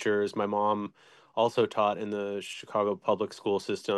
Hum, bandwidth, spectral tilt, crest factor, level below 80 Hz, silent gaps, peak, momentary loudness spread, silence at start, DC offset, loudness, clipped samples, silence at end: none; 12.5 kHz; -5 dB/octave; 18 dB; -80 dBFS; none; -12 dBFS; 8 LU; 0 s; under 0.1%; -30 LUFS; under 0.1%; 0 s